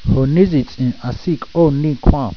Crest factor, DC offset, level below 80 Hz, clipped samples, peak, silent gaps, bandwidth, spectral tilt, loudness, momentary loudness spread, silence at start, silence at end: 14 dB; 1%; -24 dBFS; under 0.1%; 0 dBFS; none; 5.4 kHz; -9.5 dB/octave; -16 LUFS; 8 LU; 0 s; 0 s